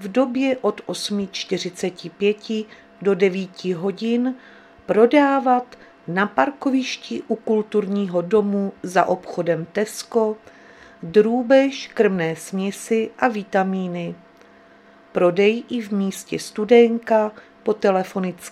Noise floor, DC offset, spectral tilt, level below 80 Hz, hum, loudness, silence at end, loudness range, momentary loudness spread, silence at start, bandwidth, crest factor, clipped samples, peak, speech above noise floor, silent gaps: -49 dBFS; under 0.1%; -5.5 dB/octave; -66 dBFS; none; -21 LUFS; 0 s; 4 LU; 12 LU; 0 s; 14.5 kHz; 20 dB; under 0.1%; 0 dBFS; 29 dB; none